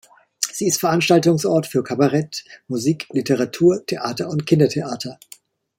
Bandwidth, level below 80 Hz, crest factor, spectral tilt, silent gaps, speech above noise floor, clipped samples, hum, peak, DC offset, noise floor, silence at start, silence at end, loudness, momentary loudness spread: 16.5 kHz; -62 dBFS; 18 dB; -5 dB/octave; none; 29 dB; under 0.1%; none; 0 dBFS; under 0.1%; -48 dBFS; 0.4 s; 0.65 s; -19 LUFS; 13 LU